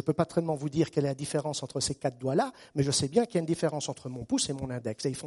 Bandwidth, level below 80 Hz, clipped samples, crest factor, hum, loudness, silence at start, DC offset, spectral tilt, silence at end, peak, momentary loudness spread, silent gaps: 11.5 kHz; -60 dBFS; under 0.1%; 20 dB; none; -30 LUFS; 0 s; under 0.1%; -5 dB/octave; 0 s; -10 dBFS; 7 LU; none